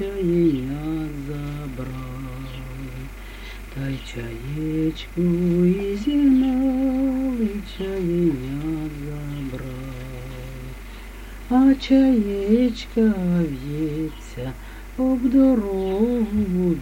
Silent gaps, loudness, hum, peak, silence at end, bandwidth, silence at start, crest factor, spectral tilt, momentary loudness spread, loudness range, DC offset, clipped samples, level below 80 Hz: none; -22 LUFS; none; -6 dBFS; 0 s; 17 kHz; 0 s; 16 dB; -8 dB/octave; 18 LU; 11 LU; under 0.1%; under 0.1%; -36 dBFS